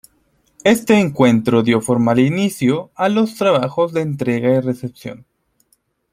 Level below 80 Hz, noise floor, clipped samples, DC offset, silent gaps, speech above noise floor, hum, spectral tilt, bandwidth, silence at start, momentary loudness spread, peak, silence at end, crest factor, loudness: -56 dBFS; -63 dBFS; under 0.1%; under 0.1%; none; 47 dB; none; -6 dB/octave; 15.5 kHz; 0.65 s; 8 LU; -2 dBFS; 0.95 s; 16 dB; -16 LUFS